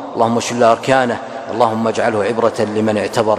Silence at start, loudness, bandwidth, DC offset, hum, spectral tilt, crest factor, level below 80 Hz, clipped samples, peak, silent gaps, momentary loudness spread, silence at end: 0 s; -16 LUFS; 14.5 kHz; under 0.1%; none; -5 dB/octave; 16 dB; -56 dBFS; under 0.1%; 0 dBFS; none; 4 LU; 0 s